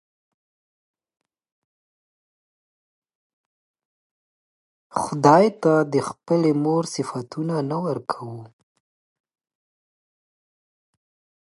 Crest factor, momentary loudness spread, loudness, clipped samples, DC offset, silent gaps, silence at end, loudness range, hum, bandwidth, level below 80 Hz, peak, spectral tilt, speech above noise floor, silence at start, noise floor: 24 dB; 14 LU; -21 LUFS; under 0.1%; under 0.1%; none; 2.95 s; 14 LU; none; 11.5 kHz; -70 dBFS; -2 dBFS; -6.5 dB/octave; over 69 dB; 4.95 s; under -90 dBFS